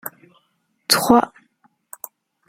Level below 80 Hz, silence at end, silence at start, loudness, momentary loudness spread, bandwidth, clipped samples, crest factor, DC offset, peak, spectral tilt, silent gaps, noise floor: -56 dBFS; 1.2 s; 0.05 s; -17 LUFS; 22 LU; 16.5 kHz; under 0.1%; 22 dB; under 0.1%; 0 dBFS; -2.5 dB/octave; none; -68 dBFS